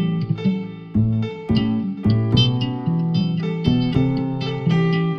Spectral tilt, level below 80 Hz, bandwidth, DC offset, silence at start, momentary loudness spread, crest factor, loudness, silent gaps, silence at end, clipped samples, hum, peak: -8 dB/octave; -40 dBFS; 6.2 kHz; under 0.1%; 0 s; 6 LU; 16 dB; -20 LUFS; none; 0 s; under 0.1%; none; -4 dBFS